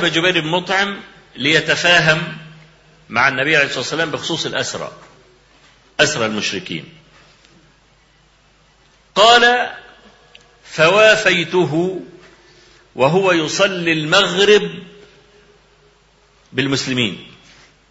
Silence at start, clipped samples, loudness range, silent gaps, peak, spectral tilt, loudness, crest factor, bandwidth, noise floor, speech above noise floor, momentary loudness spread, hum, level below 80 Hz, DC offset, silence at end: 0 s; under 0.1%; 9 LU; none; 0 dBFS; -3.5 dB/octave; -15 LUFS; 18 dB; 8 kHz; -53 dBFS; 38 dB; 18 LU; none; -54 dBFS; under 0.1%; 0.65 s